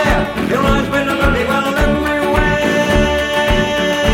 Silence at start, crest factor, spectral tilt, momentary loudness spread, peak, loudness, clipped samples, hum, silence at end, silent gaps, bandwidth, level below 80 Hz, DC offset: 0 s; 14 dB; -5 dB/octave; 2 LU; 0 dBFS; -14 LUFS; under 0.1%; none; 0 s; none; 17 kHz; -22 dBFS; under 0.1%